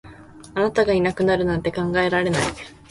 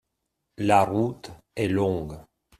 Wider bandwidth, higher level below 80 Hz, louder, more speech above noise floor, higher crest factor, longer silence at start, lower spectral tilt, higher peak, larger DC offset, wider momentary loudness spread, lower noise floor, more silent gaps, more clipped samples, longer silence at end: second, 11.5 kHz vs 14.5 kHz; first, -44 dBFS vs -54 dBFS; first, -21 LUFS vs -25 LUFS; second, 22 dB vs 56 dB; about the same, 16 dB vs 20 dB; second, 0.05 s vs 0.6 s; about the same, -5.5 dB/octave vs -6.5 dB/octave; about the same, -6 dBFS vs -6 dBFS; neither; second, 7 LU vs 19 LU; second, -43 dBFS vs -80 dBFS; neither; neither; second, 0.15 s vs 0.4 s